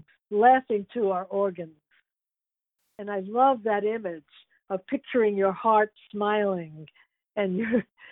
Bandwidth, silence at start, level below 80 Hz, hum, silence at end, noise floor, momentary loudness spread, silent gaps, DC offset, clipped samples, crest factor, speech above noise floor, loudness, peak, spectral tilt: 4 kHz; 0.3 s; -72 dBFS; none; 0.3 s; -90 dBFS; 14 LU; none; under 0.1%; under 0.1%; 18 dB; 64 dB; -26 LUFS; -8 dBFS; -10 dB/octave